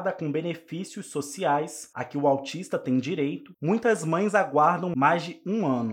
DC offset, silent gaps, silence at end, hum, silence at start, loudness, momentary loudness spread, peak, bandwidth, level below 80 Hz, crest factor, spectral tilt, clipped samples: under 0.1%; none; 0 s; none; 0 s; -26 LUFS; 11 LU; -8 dBFS; 16 kHz; -76 dBFS; 18 dB; -6 dB/octave; under 0.1%